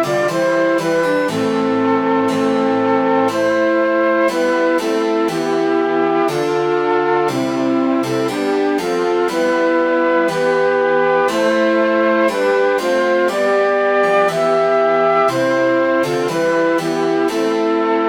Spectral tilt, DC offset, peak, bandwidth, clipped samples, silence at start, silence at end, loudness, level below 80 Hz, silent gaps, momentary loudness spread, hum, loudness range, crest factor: -5 dB/octave; under 0.1%; -2 dBFS; 17 kHz; under 0.1%; 0 s; 0 s; -16 LUFS; -56 dBFS; none; 3 LU; none; 2 LU; 12 dB